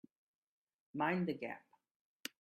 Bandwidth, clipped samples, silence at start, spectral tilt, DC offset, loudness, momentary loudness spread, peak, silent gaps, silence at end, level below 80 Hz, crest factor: 13.5 kHz; under 0.1%; 0.95 s; -6 dB/octave; under 0.1%; -41 LUFS; 14 LU; -22 dBFS; none; 0.85 s; -84 dBFS; 22 dB